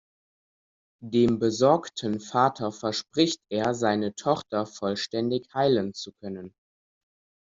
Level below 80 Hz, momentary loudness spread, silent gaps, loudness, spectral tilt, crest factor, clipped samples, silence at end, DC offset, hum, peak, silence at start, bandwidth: -64 dBFS; 13 LU; none; -26 LUFS; -5 dB/octave; 20 dB; under 0.1%; 1 s; under 0.1%; none; -6 dBFS; 1 s; 7.8 kHz